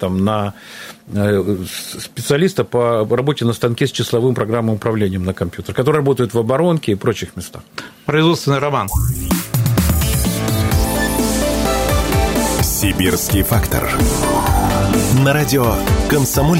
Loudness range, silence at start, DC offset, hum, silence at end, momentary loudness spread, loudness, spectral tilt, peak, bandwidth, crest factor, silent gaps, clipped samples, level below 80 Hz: 3 LU; 0 s; under 0.1%; none; 0 s; 9 LU; -16 LUFS; -5 dB/octave; 0 dBFS; 16.5 kHz; 16 dB; none; under 0.1%; -26 dBFS